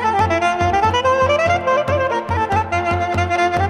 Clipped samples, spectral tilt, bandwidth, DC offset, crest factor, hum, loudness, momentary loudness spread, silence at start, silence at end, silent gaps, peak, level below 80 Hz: under 0.1%; -5.5 dB/octave; 11.5 kHz; under 0.1%; 12 dB; none; -17 LUFS; 4 LU; 0 s; 0 s; none; -4 dBFS; -38 dBFS